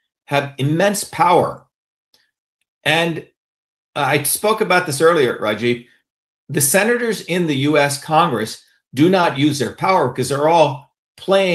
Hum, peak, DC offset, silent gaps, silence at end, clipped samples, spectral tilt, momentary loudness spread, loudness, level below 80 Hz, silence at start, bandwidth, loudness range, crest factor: none; 0 dBFS; under 0.1%; 1.74-2.13 s, 2.38-2.59 s, 2.68-2.81 s, 3.37-3.93 s, 6.10-6.47 s, 10.98-11.15 s; 0 s; under 0.1%; -4 dB/octave; 10 LU; -17 LUFS; -62 dBFS; 0.3 s; 16 kHz; 3 LU; 18 dB